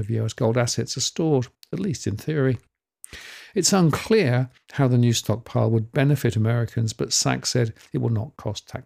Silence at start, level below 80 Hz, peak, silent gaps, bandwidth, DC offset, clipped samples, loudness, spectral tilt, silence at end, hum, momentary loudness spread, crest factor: 0 s; -56 dBFS; -6 dBFS; none; 16 kHz; under 0.1%; under 0.1%; -23 LUFS; -5 dB/octave; 0.05 s; none; 11 LU; 18 dB